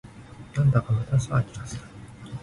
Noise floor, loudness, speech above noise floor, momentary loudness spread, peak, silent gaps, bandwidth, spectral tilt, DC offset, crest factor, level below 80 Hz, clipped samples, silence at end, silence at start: -44 dBFS; -25 LUFS; 20 dB; 22 LU; -10 dBFS; none; 11.5 kHz; -7 dB/octave; under 0.1%; 16 dB; -48 dBFS; under 0.1%; 0 s; 0.05 s